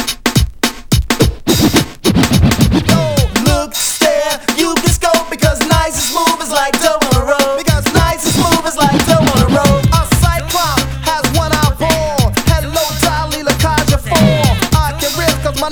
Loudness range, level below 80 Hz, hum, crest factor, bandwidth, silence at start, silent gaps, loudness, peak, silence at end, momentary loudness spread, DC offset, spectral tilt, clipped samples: 2 LU; -22 dBFS; none; 12 dB; over 20 kHz; 0 s; none; -12 LUFS; 0 dBFS; 0 s; 4 LU; under 0.1%; -4.5 dB/octave; under 0.1%